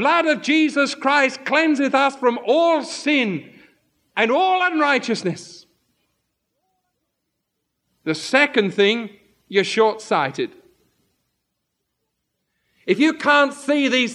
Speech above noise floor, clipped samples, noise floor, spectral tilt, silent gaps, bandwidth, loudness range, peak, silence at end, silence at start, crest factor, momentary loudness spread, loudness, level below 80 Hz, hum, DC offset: 58 dB; under 0.1%; -76 dBFS; -4 dB/octave; none; 11.5 kHz; 8 LU; -2 dBFS; 0 s; 0 s; 20 dB; 10 LU; -19 LUFS; -78 dBFS; none; under 0.1%